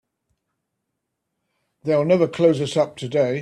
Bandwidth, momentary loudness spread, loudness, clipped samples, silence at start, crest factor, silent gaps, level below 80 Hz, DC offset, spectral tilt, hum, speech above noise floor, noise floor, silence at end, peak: 11 kHz; 5 LU; -20 LUFS; under 0.1%; 1.85 s; 18 dB; none; -64 dBFS; under 0.1%; -6.5 dB/octave; none; 60 dB; -79 dBFS; 0 s; -4 dBFS